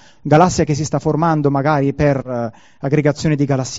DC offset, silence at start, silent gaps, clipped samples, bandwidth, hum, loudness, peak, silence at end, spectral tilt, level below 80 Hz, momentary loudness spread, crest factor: 0.4%; 0.25 s; none; under 0.1%; 7.8 kHz; none; -16 LUFS; 0 dBFS; 0 s; -7 dB/octave; -42 dBFS; 10 LU; 16 dB